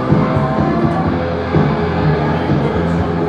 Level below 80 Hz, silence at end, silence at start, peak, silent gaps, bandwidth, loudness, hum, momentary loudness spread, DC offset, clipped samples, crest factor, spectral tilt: -30 dBFS; 0 s; 0 s; 0 dBFS; none; 7.8 kHz; -15 LUFS; none; 2 LU; under 0.1%; under 0.1%; 14 dB; -9 dB/octave